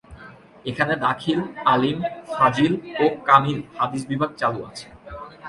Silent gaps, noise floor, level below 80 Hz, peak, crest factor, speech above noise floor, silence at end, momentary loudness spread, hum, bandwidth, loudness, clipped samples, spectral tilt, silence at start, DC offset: none; -44 dBFS; -54 dBFS; 0 dBFS; 22 dB; 23 dB; 0 s; 18 LU; none; 11.5 kHz; -21 LUFS; under 0.1%; -6 dB/octave; 0.1 s; under 0.1%